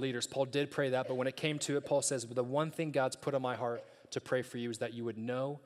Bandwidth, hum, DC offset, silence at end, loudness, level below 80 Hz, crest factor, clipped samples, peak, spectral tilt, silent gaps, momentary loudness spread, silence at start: 14 kHz; none; under 0.1%; 0.05 s; -36 LUFS; -82 dBFS; 18 dB; under 0.1%; -16 dBFS; -4.5 dB/octave; none; 7 LU; 0 s